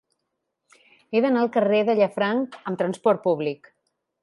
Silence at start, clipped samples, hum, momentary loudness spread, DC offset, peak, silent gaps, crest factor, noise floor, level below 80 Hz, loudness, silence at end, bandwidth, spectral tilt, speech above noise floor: 1.1 s; under 0.1%; none; 8 LU; under 0.1%; -6 dBFS; none; 18 dB; -79 dBFS; -76 dBFS; -23 LUFS; 0.65 s; 11.5 kHz; -7 dB/octave; 57 dB